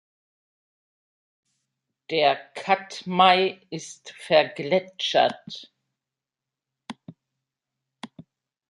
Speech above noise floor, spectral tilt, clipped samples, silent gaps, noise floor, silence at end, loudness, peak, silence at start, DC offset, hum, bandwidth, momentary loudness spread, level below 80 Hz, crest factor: 65 dB; -4 dB/octave; under 0.1%; none; -88 dBFS; 0.65 s; -22 LUFS; -4 dBFS; 2.1 s; under 0.1%; none; 11.5 kHz; 25 LU; -76 dBFS; 24 dB